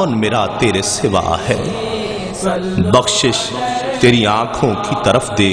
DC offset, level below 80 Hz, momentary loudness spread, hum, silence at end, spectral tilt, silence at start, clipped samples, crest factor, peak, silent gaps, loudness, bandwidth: under 0.1%; -38 dBFS; 8 LU; none; 0 s; -4.5 dB/octave; 0 s; under 0.1%; 14 dB; 0 dBFS; none; -15 LUFS; 10.5 kHz